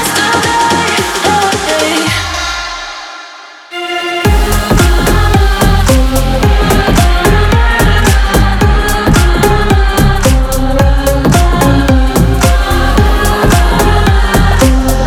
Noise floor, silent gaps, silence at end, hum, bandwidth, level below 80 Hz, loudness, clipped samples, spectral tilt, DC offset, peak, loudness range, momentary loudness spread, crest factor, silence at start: -31 dBFS; none; 0 s; none; 18.5 kHz; -12 dBFS; -10 LUFS; under 0.1%; -5 dB/octave; under 0.1%; 0 dBFS; 4 LU; 6 LU; 8 dB; 0 s